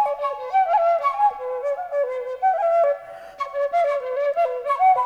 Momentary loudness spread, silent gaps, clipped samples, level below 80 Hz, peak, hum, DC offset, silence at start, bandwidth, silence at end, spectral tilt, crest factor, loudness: 8 LU; none; under 0.1%; -68 dBFS; -8 dBFS; none; under 0.1%; 0 s; 9.2 kHz; 0 s; -2.5 dB/octave; 12 dB; -22 LUFS